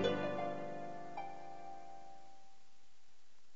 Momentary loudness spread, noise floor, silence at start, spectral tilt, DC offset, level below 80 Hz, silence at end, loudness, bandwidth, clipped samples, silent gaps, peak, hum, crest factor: 20 LU; -73 dBFS; 0 s; -4 dB/octave; 0.5%; -80 dBFS; 1.05 s; -44 LUFS; 7.6 kHz; under 0.1%; none; -22 dBFS; none; 22 dB